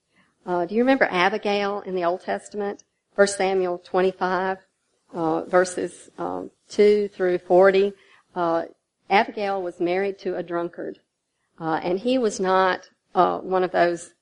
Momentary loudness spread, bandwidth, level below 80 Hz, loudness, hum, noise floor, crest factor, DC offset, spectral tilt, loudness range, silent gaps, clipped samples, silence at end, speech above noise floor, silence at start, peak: 13 LU; 10.5 kHz; -66 dBFS; -23 LUFS; none; -75 dBFS; 20 dB; under 0.1%; -5 dB/octave; 4 LU; none; under 0.1%; 0.15 s; 53 dB; 0.45 s; -2 dBFS